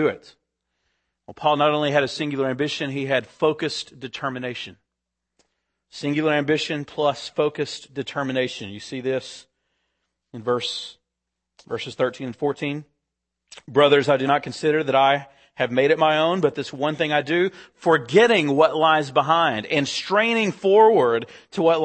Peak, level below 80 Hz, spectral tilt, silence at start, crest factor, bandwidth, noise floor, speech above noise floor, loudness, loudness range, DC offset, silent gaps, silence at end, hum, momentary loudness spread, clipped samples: -2 dBFS; -68 dBFS; -5 dB/octave; 0 s; 20 dB; 8.8 kHz; -82 dBFS; 61 dB; -21 LUFS; 10 LU; under 0.1%; none; 0 s; none; 14 LU; under 0.1%